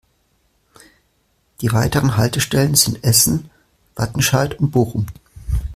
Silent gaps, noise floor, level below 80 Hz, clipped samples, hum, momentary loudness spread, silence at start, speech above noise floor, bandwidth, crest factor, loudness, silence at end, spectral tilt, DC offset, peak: none; -63 dBFS; -34 dBFS; under 0.1%; none; 12 LU; 1.6 s; 47 dB; 16 kHz; 18 dB; -17 LUFS; 0 s; -4 dB/octave; under 0.1%; 0 dBFS